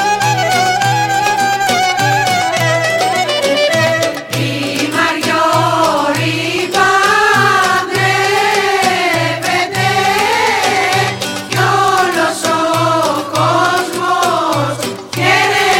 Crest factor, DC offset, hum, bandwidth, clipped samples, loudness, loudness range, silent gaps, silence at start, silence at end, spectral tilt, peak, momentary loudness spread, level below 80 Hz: 12 dB; under 0.1%; none; 17 kHz; under 0.1%; -12 LUFS; 2 LU; none; 0 s; 0 s; -3.5 dB/octave; 0 dBFS; 5 LU; -50 dBFS